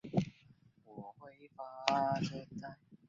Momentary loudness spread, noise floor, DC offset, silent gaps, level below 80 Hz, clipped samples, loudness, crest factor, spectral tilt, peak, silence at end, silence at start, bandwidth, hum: 21 LU; -65 dBFS; under 0.1%; none; -70 dBFS; under 0.1%; -37 LUFS; 32 dB; -4.5 dB/octave; -8 dBFS; 0.1 s; 0.05 s; 7.6 kHz; none